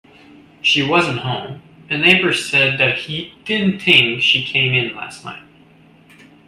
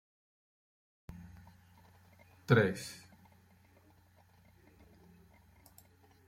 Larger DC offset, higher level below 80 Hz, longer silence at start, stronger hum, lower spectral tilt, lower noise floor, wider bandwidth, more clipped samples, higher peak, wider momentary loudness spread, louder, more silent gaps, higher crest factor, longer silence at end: neither; first, -58 dBFS vs -68 dBFS; second, 0.65 s vs 1.1 s; neither; second, -4 dB/octave vs -6.5 dB/octave; second, -48 dBFS vs -65 dBFS; second, 14.5 kHz vs 16 kHz; neither; first, 0 dBFS vs -14 dBFS; second, 15 LU vs 29 LU; first, -15 LUFS vs -32 LUFS; neither; second, 18 dB vs 26 dB; second, 1.1 s vs 3.3 s